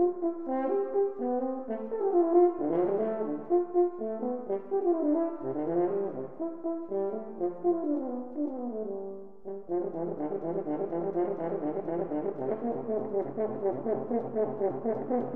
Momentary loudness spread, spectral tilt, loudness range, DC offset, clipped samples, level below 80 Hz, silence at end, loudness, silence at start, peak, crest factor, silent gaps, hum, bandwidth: 8 LU; -12 dB/octave; 5 LU; 0.4%; under 0.1%; -70 dBFS; 0 s; -31 LUFS; 0 s; -12 dBFS; 18 dB; none; none; 2.9 kHz